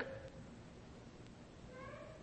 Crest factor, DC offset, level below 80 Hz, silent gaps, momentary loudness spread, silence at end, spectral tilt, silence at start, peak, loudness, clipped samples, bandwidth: 22 dB; under 0.1%; -64 dBFS; none; 5 LU; 0 s; -6 dB/octave; 0 s; -30 dBFS; -54 LUFS; under 0.1%; 8.4 kHz